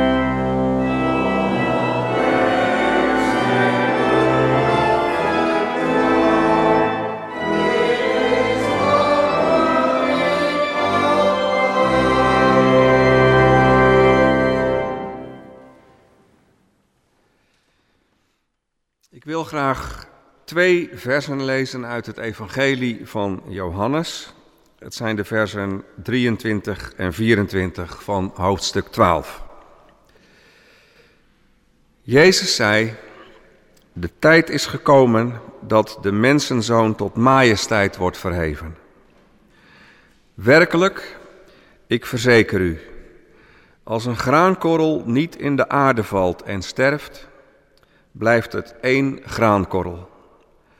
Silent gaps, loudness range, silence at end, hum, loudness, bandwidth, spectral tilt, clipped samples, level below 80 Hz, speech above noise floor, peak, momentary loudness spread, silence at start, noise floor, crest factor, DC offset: none; 8 LU; 0.75 s; none; -18 LUFS; 16 kHz; -5.5 dB/octave; under 0.1%; -42 dBFS; 56 dB; -2 dBFS; 14 LU; 0 s; -74 dBFS; 16 dB; under 0.1%